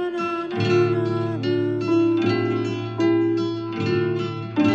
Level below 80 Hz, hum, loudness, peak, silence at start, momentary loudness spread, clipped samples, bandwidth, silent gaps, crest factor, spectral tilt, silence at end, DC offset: -64 dBFS; none; -22 LUFS; -8 dBFS; 0 s; 6 LU; under 0.1%; 7.4 kHz; none; 14 dB; -7.5 dB/octave; 0 s; under 0.1%